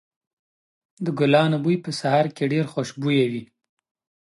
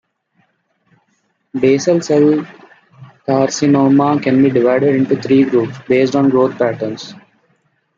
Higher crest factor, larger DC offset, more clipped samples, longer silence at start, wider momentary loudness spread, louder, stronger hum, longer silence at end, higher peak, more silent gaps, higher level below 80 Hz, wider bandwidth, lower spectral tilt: about the same, 18 dB vs 14 dB; neither; neither; second, 1 s vs 1.55 s; about the same, 10 LU vs 12 LU; second, -22 LUFS vs -14 LUFS; neither; about the same, 0.85 s vs 0.8 s; second, -6 dBFS vs -2 dBFS; neither; second, -70 dBFS vs -58 dBFS; first, 11.5 kHz vs 7.6 kHz; about the same, -6.5 dB/octave vs -6.5 dB/octave